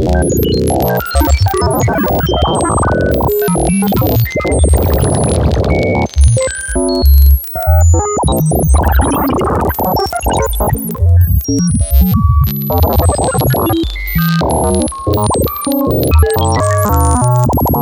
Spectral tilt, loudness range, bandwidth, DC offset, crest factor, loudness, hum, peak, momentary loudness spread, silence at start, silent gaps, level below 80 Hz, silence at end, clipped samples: -6 dB/octave; 2 LU; 17.5 kHz; under 0.1%; 10 dB; -12 LUFS; none; 0 dBFS; 4 LU; 0 s; none; -16 dBFS; 0 s; under 0.1%